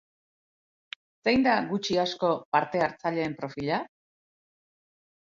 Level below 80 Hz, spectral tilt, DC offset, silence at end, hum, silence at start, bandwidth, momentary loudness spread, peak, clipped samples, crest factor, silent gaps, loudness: -64 dBFS; -5.5 dB/octave; under 0.1%; 1.45 s; none; 1.25 s; 7.6 kHz; 19 LU; -8 dBFS; under 0.1%; 20 dB; 2.45-2.52 s; -27 LUFS